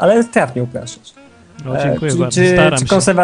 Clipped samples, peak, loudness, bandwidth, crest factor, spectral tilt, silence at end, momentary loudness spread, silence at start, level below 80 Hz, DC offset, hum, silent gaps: under 0.1%; 0 dBFS; -14 LUFS; 10.5 kHz; 14 dB; -5 dB/octave; 0 s; 15 LU; 0 s; -42 dBFS; under 0.1%; none; none